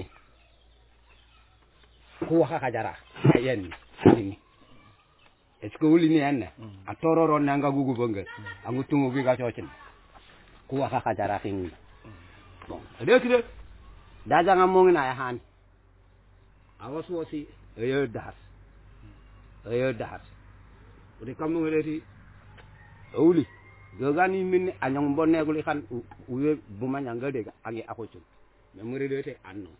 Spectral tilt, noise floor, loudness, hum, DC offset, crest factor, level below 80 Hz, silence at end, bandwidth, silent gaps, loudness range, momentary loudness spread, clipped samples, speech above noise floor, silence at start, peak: -11 dB/octave; -60 dBFS; -26 LUFS; none; under 0.1%; 24 dB; -56 dBFS; 0.1 s; 4 kHz; none; 9 LU; 21 LU; under 0.1%; 35 dB; 0 s; -4 dBFS